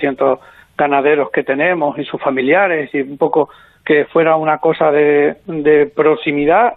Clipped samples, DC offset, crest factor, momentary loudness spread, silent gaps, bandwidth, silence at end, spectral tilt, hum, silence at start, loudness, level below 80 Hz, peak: under 0.1%; under 0.1%; 12 dB; 7 LU; none; 4.1 kHz; 0 s; -9 dB/octave; none; 0 s; -14 LUFS; -54 dBFS; -2 dBFS